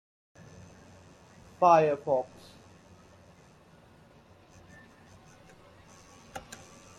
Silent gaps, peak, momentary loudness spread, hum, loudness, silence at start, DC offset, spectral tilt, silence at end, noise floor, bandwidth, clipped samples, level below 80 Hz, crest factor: none; -10 dBFS; 31 LU; none; -25 LUFS; 1.6 s; under 0.1%; -6 dB/octave; 0.6 s; -57 dBFS; 15.5 kHz; under 0.1%; -68 dBFS; 24 dB